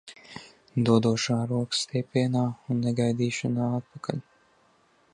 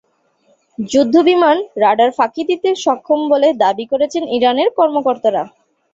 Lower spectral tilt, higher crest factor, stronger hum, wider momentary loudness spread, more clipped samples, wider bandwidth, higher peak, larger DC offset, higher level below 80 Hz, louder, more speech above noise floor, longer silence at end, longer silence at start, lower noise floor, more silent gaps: first, -6 dB/octave vs -4.5 dB/octave; first, 20 dB vs 14 dB; neither; first, 15 LU vs 6 LU; neither; first, 10.5 kHz vs 8 kHz; second, -8 dBFS vs -2 dBFS; neither; about the same, -64 dBFS vs -60 dBFS; second, -27 LUFS vs -14 LUFS; second, 38 dB vs 44 dB; first, 0.9 s vs 0.45 s; second, 0.05 s vs 0.8 s; first, -64 dBFS vs -58 dBFS; neither